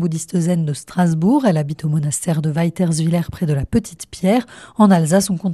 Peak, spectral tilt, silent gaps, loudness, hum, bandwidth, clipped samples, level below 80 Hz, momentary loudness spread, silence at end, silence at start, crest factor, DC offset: 0 dBFS; -6.5 dB/octave; none; -18 LUFS; none; 13 kHz; under 0.1%; -44 dBFS; 7 LU; 0 s; 0 s; 16 dB; under 0.1%